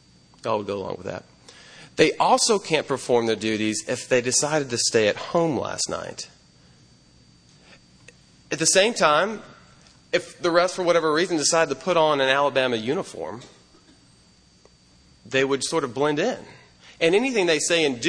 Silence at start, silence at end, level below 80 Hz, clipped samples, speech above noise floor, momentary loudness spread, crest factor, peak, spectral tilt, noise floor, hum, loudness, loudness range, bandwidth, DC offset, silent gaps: 0.45 s; 0 s; -62 dBFS; under 0.1%; 34 dB; 14 LU; 22 dB; -2 dBFS; -3 dB/octave; -56 dBFS; none; -22 LUFS; 7 LU; 10.5 kHz; under 0.1%; none